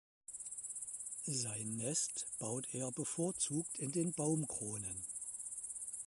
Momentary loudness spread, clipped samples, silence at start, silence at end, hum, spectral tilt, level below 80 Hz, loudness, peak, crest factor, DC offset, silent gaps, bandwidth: 7 LU; under 0.1%; 0.3 s; 0 s; none; -4 dB/octave; -74 dBFS; -40 LUFS; -24 dBFS; 18 dB; under 0.1%; none; 12 kHz